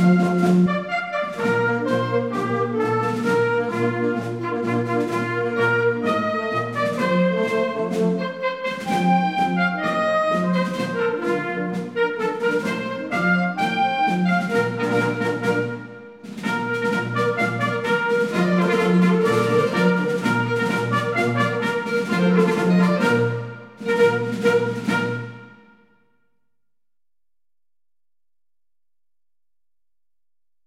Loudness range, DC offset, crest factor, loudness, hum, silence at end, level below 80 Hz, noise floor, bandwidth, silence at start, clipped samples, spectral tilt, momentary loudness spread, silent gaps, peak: 4 LU; under 0.1%; 16 dB; -21 LUFS; none; 5.15 s; -64 dBFS; under -90 dBFS; 14 kHz; 0 s; under 0.1%; -6.5 dB/octave; 7 LU; none; -6 dBFS